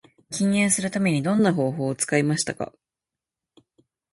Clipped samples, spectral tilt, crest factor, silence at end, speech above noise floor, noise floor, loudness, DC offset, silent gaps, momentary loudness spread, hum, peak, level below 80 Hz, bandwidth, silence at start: under 0.1%; -4.5 dB/octave; 20 dB; 1.45 s; 66 dB; -88 dBFS; -23 LUFS; under 0.1%; none; 10 LU; none; -6 dBFS; -64 dBFS; 11.5 kHz; 0.3 s